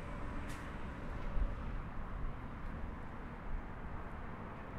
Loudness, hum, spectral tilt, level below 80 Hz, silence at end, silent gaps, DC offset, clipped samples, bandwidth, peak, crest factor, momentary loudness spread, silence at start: -46 LUFS; none; -7 dB/octave; -44 dBFS; 0 s; none; under 0.1%; under 0.1%; 11.5 kHz; -24 dBFS; 18 dB; 5 LU; 0 s